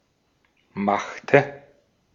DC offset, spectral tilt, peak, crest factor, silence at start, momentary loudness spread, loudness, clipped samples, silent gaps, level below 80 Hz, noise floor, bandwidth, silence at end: under 0.1%; -6.5 dB/octave; -2 dBFS; 24 dB; 0.75 s; 14 LU; -22 LUFS; under 0.1%; none; -66 dBFS; -67 dBFS; 7.4 kHz; 0.55 s